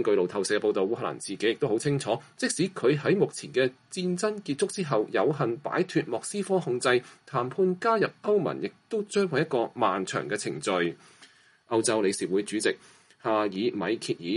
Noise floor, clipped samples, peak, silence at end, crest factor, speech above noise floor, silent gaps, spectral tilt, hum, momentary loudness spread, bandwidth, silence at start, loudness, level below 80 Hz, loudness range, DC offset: -57 dBFS; under 0.1%; -10 dBFS; 0 s; 18 dB; 30 dB; none; -4.5 dB/octave; none; 6 LU; 11.5 kHz; 0 s; -28 LUFS; -74 dBFS; 2 LU; under 0.1%